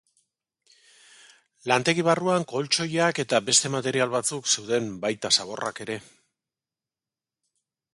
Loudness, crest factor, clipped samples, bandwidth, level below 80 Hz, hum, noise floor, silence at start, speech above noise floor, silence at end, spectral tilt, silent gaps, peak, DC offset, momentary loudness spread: -24 LUFS; 22 dB; under 0.1%; 11.5 kHz; -70 dBFS; none; under -90 dBFS; 1.65 s; over 65 dB; 1.95 s; -2.5 dB/octave; none; -4 dBFS; under 0.1%; 11 LU